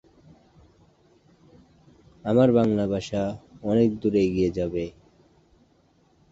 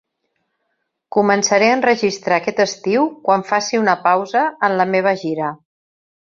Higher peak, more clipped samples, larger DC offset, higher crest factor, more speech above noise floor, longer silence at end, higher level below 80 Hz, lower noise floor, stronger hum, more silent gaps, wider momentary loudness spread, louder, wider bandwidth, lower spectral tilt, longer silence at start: second, -6 dBFS vs 0 dBFS; neither; neither; about the same, 20 dB vs 16 dB; second, 40 dB vs 56 dB; first, 1.4 s vs 0.8 s; first, -52 dBFS vs -64 dBFS; second, -62 dBFS vs -72 dBFS; neither; neither; first, 13 LU vs 6 LU; second, -24 LUFS vs -17 LUFS; about the same, 8 kHz vs 7.6 kHz; first, -8 dB/octave vs -4 dB/octave; first, 2.25 s vs 1.15 s